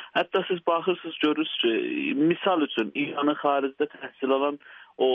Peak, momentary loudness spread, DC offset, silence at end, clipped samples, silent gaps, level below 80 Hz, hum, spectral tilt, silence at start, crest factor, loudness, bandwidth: -10 dBFS; 6 LU; under 0.1%; 0 s; under 0.1%; none; -76 dBFS; none; -7 dB/octave; 0 s; 16 dB; -26 LUFS; 5.2 kHz